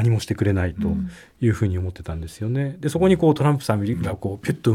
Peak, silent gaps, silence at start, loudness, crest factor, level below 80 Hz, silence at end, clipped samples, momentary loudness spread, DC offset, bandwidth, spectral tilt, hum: -4 dBFS; none; 0 s; -22 LUFS; 16 dB; -44 dBFS; 0 s; under 0.1%; 11 LU; under 0.1%; 15 kHz; -7.5 dB/octave; none